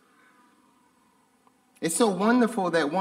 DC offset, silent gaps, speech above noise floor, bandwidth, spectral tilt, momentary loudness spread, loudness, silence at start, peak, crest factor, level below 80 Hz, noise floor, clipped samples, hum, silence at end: under 0.1%; none; 41 dB; 16 kHz; -4.5 dB/octave; 7 LU; -24 LUFS; 1.8 s; -8 dBFS; 20 dB; -76 dBFS; -64 dBFS; under 0.1%; none; 0 s